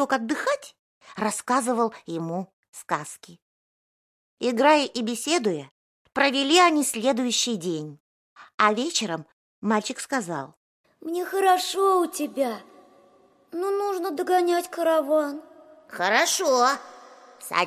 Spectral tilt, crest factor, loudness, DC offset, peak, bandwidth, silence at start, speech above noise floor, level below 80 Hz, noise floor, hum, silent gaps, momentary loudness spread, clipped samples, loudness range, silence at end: -3 dB/octave; 22 dB; -24 LUFS; under 0.1%; -4 dBFS; 16 kHz; 0 s; 35 dB; -78 dBFS; -58 dBFS; none; 0.79-1.01 s, 2.53-2.73 s, 3.42-4.37 s, 5.71-6.05 s, 8.00-8.36 s, 8.54-8.58 s, 9.33-9.62 s, 10.57-10.84 s; 15 LU; under 0.1%; 6 LU; 0 s